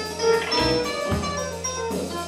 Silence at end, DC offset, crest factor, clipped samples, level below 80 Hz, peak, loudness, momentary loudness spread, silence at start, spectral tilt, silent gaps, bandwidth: 0 s; under 0.1%; 16 dB; under 0.1%; -42 dBFS; -8 dBFS; -24 LUFS; 7 LU; 0 s; -3.5 dB/octave; none; 16 kHz